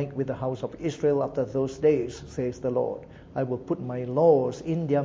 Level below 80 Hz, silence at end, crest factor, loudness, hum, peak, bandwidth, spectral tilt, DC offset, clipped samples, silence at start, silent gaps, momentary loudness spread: -54 dBFS; 0 s; 18 dB; -27 LUFS; none; -8 dBFS; 7.8 kHz; -8 dB/octave; under 0.1%; under 0.1%; 0 s; none; 11 LU